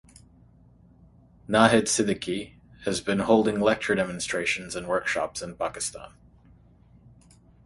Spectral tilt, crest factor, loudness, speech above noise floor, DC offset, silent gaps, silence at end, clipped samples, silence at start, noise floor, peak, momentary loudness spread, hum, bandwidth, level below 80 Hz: -4 dB/octave; 24 dB; -25 LUFS; 31 dB; under 0.1%; none; 1.6 s; under 0.1%; 1.5 s; -55 dBFS; -2 dBFS; 13 LU; none; 11.5 kHz; -56 dBFS